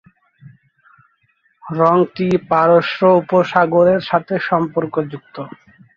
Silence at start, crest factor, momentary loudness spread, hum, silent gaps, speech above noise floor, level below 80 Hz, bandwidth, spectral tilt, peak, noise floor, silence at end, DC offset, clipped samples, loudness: 0.45 s; 16 dB; 15 LU; none; none; 46 dB; -58 dBFS; 7 kHz; -8 dB/octave; -2 dBFS; -61 dBFS; 0.5 s; under 0.1%; under 0.1%; -15 LUFS